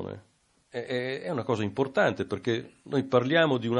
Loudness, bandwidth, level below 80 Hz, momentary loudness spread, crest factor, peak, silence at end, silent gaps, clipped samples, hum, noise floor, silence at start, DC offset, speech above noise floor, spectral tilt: -28 LUFS; 10.5 kHz; -62 dBFS; 15 LU; 20 dB; -8 dBFS; 0 s; none; under 0.1%; none; -66 dBFS; 0 s; under 0.1%; 39 dB; -6.5 dB/octave